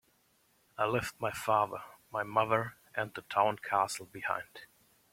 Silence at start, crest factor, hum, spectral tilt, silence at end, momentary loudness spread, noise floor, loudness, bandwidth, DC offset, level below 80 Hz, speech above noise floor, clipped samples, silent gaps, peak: 0.8 s; 22 dB; none; -4.5 dB/octave; 0.5 s; 10 LU; -71 dBFS; -33 LUFS; 16.5 kHz; under 0.1%; -68 dBFS; 38 dB; under 0.1%; none; -12 dBFS